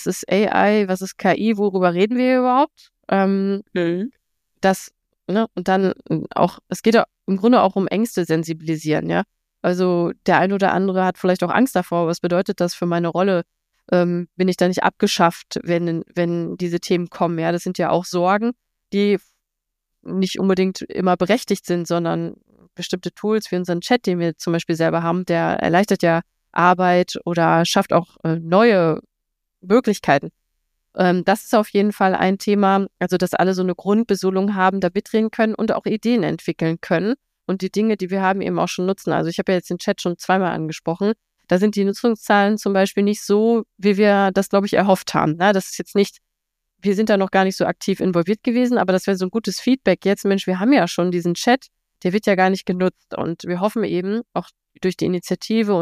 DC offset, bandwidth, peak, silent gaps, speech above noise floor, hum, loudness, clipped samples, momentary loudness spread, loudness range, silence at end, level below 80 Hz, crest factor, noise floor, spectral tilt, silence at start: under 0.1%; 15.5 kHz; -2 dBFS; none; 61 dB; none; -19 LUFS; under 0.1%; 7 LU; 4 LU; 0 s; -58 dBFS; 18 dB; -80 dBFS; -6 dB/octave; 0 s